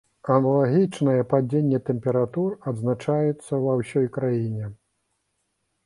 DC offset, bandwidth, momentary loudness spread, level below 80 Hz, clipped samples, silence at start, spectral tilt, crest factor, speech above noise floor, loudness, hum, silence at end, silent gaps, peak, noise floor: under 0.1%; 11.5 kHz; 7 LU; -62 dBFS; under 0.1%; 0.25 s; -9 dB/octave; 18 dB; 52 dB; -23 LUFS; none; 1.1 s; none; -6 dBFS; -74 dBFS